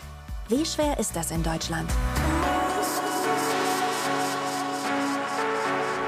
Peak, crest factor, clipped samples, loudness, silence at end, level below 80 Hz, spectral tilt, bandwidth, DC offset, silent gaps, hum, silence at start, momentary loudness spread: -12 dBFS; 14 dB; under 0.1%; -26 LUFS; 0 s; -36 dBFS; -4 dB/octave; 16 kHz; under 0.1%; none; none; 0 s; 4 LU